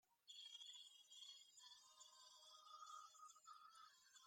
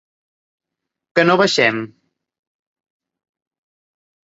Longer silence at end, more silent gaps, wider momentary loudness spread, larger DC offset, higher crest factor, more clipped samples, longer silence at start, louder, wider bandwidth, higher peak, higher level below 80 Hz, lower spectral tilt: second, 0 s vs 2.45 s; neither; second, 7 LU vs 14 LU; neither; about the same, 16 dB vs 20 dB; neither; second, 0.05 s vs 1.15 s; second, -62 LUFS vs -15 LUFS; first, 16 kHz vs 8 kHz; second, -48 dBFS vs -2 dBFS; second, under -90 dBFS vs -66 dBFS; second, 4 dB/octave vs -4.5 dB/octave